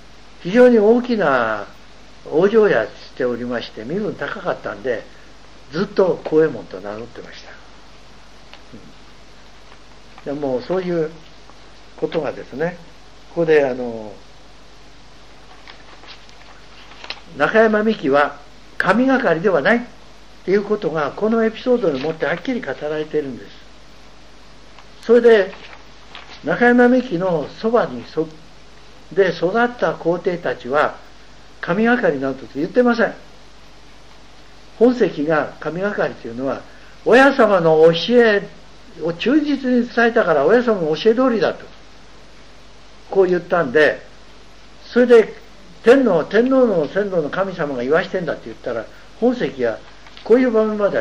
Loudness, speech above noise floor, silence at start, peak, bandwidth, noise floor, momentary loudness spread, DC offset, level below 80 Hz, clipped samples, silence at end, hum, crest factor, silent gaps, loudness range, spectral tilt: -17 LUFS; 28 dB; 0.4 s; -2 dBFS; 8.4 kHz; -45 dBFS; 16 LU; 0.9%; -50 dBFS; under 0.1%; 0 s; none; 16 dB; none; 9 LU; -6.5 dB/octave